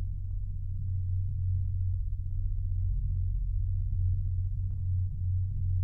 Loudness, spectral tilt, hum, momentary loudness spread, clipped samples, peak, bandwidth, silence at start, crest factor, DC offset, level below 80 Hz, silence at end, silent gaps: -33 LUFS; -12 dB/octave; none; 5 LU; under 0.1%; -20 dBFS; 0.4 kHz; 0 s; 10 dB; under 0.1%; -34 dBFS; 0 s; none